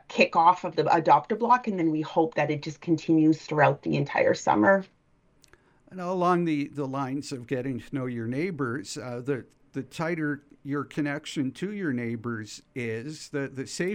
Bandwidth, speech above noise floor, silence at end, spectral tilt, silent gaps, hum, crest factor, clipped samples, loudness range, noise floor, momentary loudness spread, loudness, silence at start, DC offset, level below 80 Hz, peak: 11 kHz; 38 dB; 0 s; -6 dB/octave; none; none; 20 dB; under 0.1%; 8 LU; -64 dBFS; 13 LU; -27 LUFS; 0.1 s; under 0.1%; -66 dBFS; -6 dBFS